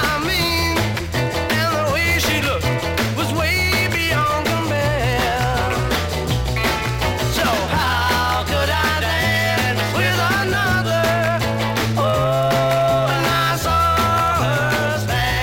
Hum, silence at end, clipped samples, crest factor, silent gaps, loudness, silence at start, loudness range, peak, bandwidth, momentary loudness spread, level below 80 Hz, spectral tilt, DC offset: none; 0 s; under 0.1%; 14 dB; none; -18 LUFS; 0 s; 2 LU; -6 dBFS; 17 kHz; 4 LU; -34 dBFS; -4.5 dB/octave; under 0.1%